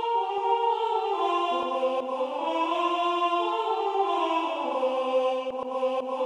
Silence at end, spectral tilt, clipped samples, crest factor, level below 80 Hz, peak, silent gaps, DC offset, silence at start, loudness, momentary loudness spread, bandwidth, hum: 0 s; -3 dB/octave; under 0.1%; 12 dB; -78 dBFS; -14 dBFS; none; under 0.1%; 0 s; -27 LUFS; 3 LU; 10.5 kHz; none